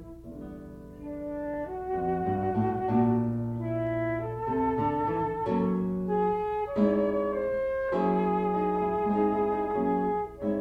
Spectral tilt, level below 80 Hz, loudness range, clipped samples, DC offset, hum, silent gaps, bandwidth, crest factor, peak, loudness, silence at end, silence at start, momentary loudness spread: -10 dB/octave; -52 dBFS; 2 LU; under 0.1%; under 0.1%; none; none; 5.4 kHz; 14 dB; -14 dBFS; -28 LUFS; 0 s; 0 s; 10 LU